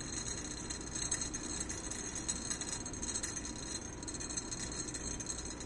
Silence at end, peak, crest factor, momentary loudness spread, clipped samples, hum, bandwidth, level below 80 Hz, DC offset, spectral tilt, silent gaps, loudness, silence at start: 0 s; -20 dBFS; 22 dB; 5 LU; under 0.1%; none; 11.5 kHz; -52 dBFS; under 0.1%; -2 dB/octave; none; -39 LUFS; 0 s